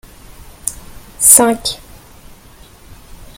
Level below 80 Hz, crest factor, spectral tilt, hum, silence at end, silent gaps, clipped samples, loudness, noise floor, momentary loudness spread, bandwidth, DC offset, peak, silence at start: -40 dBFS; 18 dB; -1.5 dB/octave; none; 0.15 s; none; 0.4%; -11 LUFS; -41 dBFS; 18 LU; over 20 kHz; under 0.1%; 0 dBFS; 0.65 s